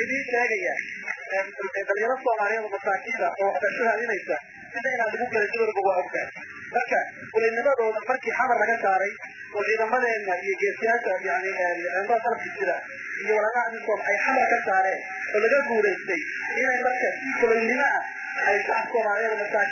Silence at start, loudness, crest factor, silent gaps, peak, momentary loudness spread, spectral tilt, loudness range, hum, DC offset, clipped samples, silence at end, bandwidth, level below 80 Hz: 0 s; -25 LUFS; 16 dB; none; -10 dBFS; 8 LU; -3.5 dB/octave; 3 LU; none; under 0.1%; under 0.1%; 0 s; 7 kHz; -70 dBFS